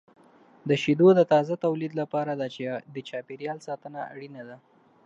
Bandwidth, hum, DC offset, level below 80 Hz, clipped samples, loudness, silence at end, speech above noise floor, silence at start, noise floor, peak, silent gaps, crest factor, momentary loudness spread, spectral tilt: 7.8 kHz; none; under 0.1%; -76 dBFS; under 0.1%; -25 LUFS; 0.5 s; 29 dB; 0.65 s; -55 dBFS; -8 dBFS; none; 20 dB; 21 LU; -7 dB/octave